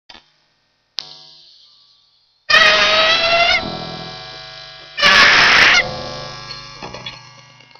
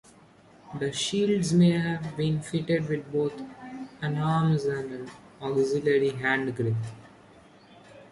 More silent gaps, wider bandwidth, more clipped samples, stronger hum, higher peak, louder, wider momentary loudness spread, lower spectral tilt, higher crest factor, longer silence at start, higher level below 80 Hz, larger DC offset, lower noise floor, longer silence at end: neither; first, 16 kHz vs 11.5 kHz; neither; neither; first, 0 dBFS vs -12 dBFS; first, -10 LUFS vs -27 LUFS; first, 24 LU vs 17 LU; second, -1.5 dB/octave vs -6 dB/octave; about the same, 18 dB vs 16 dB; first, 1 s vs 0.65 s; first, -46 dBFS vs -62 dBFS; neither; first, -63 dBFS vs -55 dBFS; first, 0.6 s vs 0.1 s